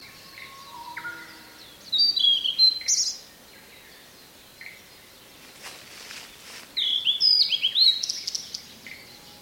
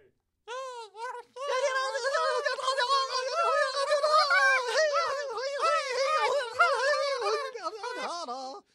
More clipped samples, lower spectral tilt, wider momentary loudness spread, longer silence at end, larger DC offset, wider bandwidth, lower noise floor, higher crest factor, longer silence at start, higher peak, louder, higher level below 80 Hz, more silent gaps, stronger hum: neither; about the same, 2 dB/octave vs 1 dB/octave; first, 25 LU vs 15 LU; about the same, 0.05 s vs 0.15 s; neither; first, 17 kHz vs 13 kHz; second, -50 dBFS vs -55 dBFS; about the same, 18 dB vs 18 dB; second, 0 s vs 0.45 s; first, -8 dBFS vs -12 dBFS; first, -20 LUFS vs -27 LUFS; first, -68 dBFS vs -82 dBFS; neither; neither